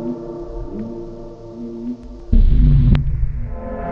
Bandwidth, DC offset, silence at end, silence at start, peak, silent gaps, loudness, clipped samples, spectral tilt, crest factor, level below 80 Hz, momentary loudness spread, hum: 4.3 kHz; under 0.1%; 0 s; 0 s; 0 dBFS; none; -20 LUFS; under 0.1%; -10.5 dB/octave; 16 dB; -18 dBFS; 18 LU; none